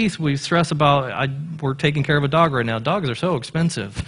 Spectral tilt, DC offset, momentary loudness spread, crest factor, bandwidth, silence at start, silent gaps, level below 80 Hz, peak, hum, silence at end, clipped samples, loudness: -6 dB/octave; under 0.1%; 7 LU; 18 dB; 11 kHz; 0 s; none; -46 dBFS; -2 dBFS; none; 0 s; under 0.1%; -20 LUFS